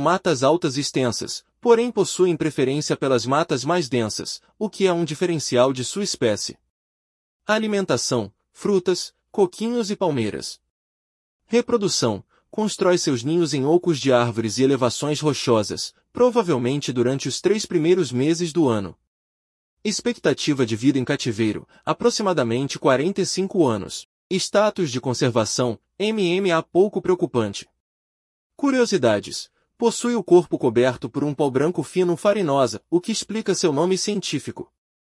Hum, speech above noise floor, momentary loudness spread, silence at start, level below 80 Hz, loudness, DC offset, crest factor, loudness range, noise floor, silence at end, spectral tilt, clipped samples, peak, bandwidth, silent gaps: none; over 69 dB; 8 LU; 0 s; -62 dBFS; -21 LUFS; under 0.1%; 18 dB; 3 LU; under -90 dBFS; 0.4 s; -5 dB/octave; under 0.1%; -4 dBFS; 12 kHz; 6.70-7.40 s, 10.70-11.39 s, 19.07-19.77 s, 24.05-24.30 s, 27.80-28.50 s